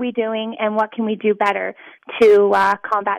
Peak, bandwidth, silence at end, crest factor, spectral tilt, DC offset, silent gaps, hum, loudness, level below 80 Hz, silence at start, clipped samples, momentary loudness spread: -6 dBFS; 10 kHz; 0 s; 12 dB; -5.5 dB/octave; under 0.1%; none; none; -17 LUFS; -62 dBFS; 0 s; under 0.1%; 11 LU